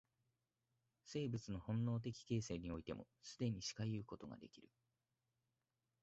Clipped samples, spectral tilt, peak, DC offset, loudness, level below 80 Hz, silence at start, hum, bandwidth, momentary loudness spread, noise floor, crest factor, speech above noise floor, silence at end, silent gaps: under 0.1%; -7 dB/octave; -30 dBFS; under 0.1%; -46 LUFS; -68 dBFS; 1.05 s; none; 8 kHz; 13 LU; under -90 dBFS; 18 dB; over 44 dB; 1.4 s; none